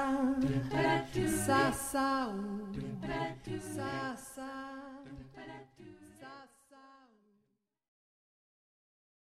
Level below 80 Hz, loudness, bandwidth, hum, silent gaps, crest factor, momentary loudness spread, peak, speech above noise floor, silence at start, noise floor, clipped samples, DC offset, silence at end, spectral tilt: -58 dBFS; -34 LUFS; 16 kHz; none; none; 20 dB; 22 LU; -18 dBFS; 45 dB; 0 s; -80 dBFS; under 0.1%; under 0.1%; 2.35 s; -5 dB/octave